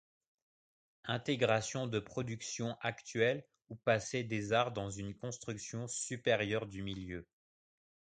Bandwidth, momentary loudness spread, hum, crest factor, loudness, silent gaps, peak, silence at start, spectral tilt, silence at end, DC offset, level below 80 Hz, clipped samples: 9.4 kHz; 10 LU; none; 22 dB; -37 LUFS; none; -16 dBFS; 1.05 s; -4.5 dB/octave; 0.9 s; under 0.1%; -66 dBFS; under 0.1%